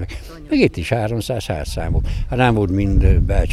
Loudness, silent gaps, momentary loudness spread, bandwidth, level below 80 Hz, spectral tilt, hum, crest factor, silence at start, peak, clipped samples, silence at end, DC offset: -19 LUFS; none; 8 LU; 13.5 kHz; -22 dBFS; -7 dB/octave; none; 14 dB; 0 s; -2 dBFS; under 0.1%; 0 s; under 0.1%